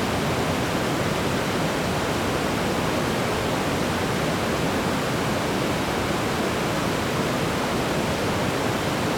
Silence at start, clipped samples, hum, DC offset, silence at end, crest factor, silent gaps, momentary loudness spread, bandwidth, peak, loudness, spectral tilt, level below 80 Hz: 0 s; under 0.1%; none; under 0.1%; 0 s; 14 dB; none; 0 LU; 19.5 kHz; -10 dBFS; -24 LUFS; -4.5 dB/octave; -44 dBFS